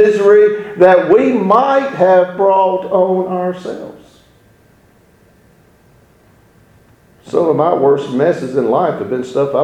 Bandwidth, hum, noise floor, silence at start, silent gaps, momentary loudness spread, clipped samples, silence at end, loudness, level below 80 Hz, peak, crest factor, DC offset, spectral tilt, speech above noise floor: 8.8 kHz; none; -49 dBFS; 0 s; none; 11 LU; under 0.1%; 0 s; -12 LUFS; -56 dBFS; 0 dBFS; 14 dB; under 0.1%; -7.5 dB/octave; 37 dB